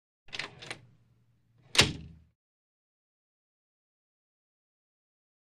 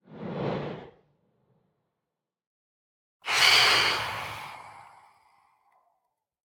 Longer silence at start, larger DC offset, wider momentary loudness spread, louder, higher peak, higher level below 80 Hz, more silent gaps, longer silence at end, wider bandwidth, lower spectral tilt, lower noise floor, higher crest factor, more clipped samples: first, 0.3 s vs 0.1 s; neither; second, 21 LU vs 24 LU; second, -29 LUFS vs -22 LUFS; about the same, -6 dBFS vs -6 dBFS; first, -58 dBFS vs -64 dBFS; second, none vs 2.47-3.20 s; first, 3.35 s vs 1.65 s; second, 14.5 kHz vs over 20 kHz; about the same, -2 dB/octave vs -1.5 dB/octave; second, -68 dBFS vs -87 dBFS; first, 32 dB vs 24 dB; neither